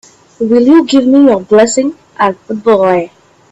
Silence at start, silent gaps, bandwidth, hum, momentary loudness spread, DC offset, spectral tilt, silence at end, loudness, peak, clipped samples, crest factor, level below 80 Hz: 0.4 s; none; 8.2 kHz; none; 9 LU; under 0.1%; -5 dB/octave; 0.45 s; -10 LUFS; 0 dBFS; under 0.1%; 10 dB; -52 dBFS